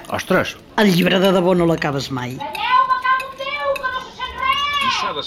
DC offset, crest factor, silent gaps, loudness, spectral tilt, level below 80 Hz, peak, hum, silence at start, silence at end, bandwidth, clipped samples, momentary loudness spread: under 0.1%; 14 dB; none; -18 LUFS; -5 dB/octave; -48 dBFS; -4 dBFS; none; 0 s; 0 s; 16.5 kHz; under 0.1%; 10 LU